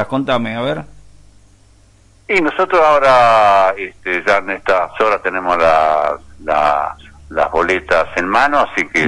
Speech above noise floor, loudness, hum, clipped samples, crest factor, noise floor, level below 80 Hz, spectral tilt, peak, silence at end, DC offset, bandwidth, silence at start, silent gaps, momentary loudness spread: 34 dB; -14 LUFS; none; under 0.1%; 12 dB; -48 dBFS; -42 dBFS; -5 dB/octave; -2 dBFS; 0 s; under 0.1%; 11 kHz; 0 s; none; 11 LU